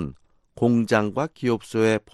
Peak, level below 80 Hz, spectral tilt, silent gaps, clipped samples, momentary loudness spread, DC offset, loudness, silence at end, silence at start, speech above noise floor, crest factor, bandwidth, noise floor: -6 dBFS; -54 dBFS; -6.5 dB/octave; none; under 0.1%; 6 LU; under 0.1%; -23 LUFS; 0.15 s; 0 s; 22 dB; 16 dB; 12.5 kHz; -44 dBFS